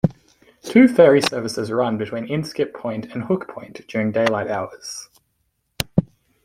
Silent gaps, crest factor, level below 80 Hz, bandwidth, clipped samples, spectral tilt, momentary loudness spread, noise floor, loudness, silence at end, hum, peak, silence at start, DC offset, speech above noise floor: none; 18 dB; -52 dBFS; 16 kHz; under 0.1%; -6 dB/octave; 18 LU; -70 dBFS; -20 LUFS; 0.4 s; none; -2 dBFS; 0.05 s; under 0.1%; 51 dB